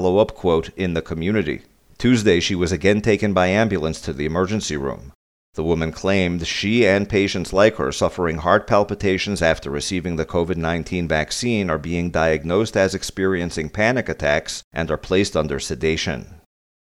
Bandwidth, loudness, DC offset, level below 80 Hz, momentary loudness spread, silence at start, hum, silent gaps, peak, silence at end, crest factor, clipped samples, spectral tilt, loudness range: 14.5 kHz; -20 LUFS; under 0.1%; -40 dBFS; 8 LU; 0 s; none; 5.15-5.53 s, 14.64-14.71 s; 0 dBFS; 0.5 s; 20 dB; under 0.1%; -5 dB/octave; 3 LU